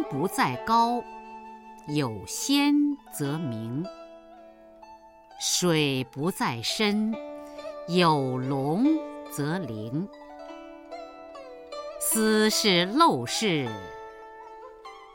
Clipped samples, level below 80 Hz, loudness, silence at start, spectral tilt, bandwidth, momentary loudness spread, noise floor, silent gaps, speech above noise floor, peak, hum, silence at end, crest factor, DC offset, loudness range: under 0.1%; -62 dBFS; -26 LUFS; 0 s; -4 dB/octave; 17 kHz; 22 LU; -50 dBFS; none; 25 dB; -8 dBFS; none; 0 s; 20 dB; under 0.1%; 5 LU